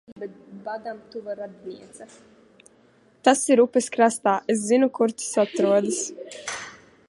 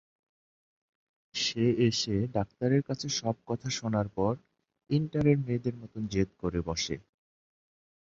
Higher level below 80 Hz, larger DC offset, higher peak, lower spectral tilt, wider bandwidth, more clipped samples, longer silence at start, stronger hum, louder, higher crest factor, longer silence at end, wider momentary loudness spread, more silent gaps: second, -74 dBFS vs -54 dBFS; neither; first, -4 dBFS vs -12 dBFS; second, -3.5 dB/octave vs -5.5 dB/octave; first, 11.5 kHz vs 7.8 kHz; neither; second, 0.1 s vs 1.35 s; neither; first, -22 LUFS vs -30 LUFS; about the same, 20 dB vs 20 dB; second, 0.35 s vs 1.1 s; first, 20 LU vs 8 LU; first, 0.12-0.16 s vs none